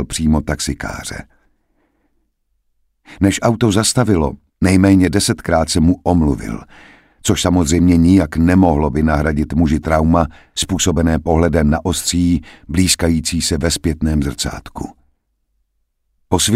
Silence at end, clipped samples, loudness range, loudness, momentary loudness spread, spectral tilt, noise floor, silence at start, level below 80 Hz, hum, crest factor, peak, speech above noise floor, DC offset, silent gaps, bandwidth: 0 s; under 0.1%; 6 LU; -15 LUFS; 11 LU; -5 dB/octave; -67 dBFS; 0 s; -28 dBFS; none; 14 dB; 0 dBFS; 52 dB; under 0.1%; none; 16 kHz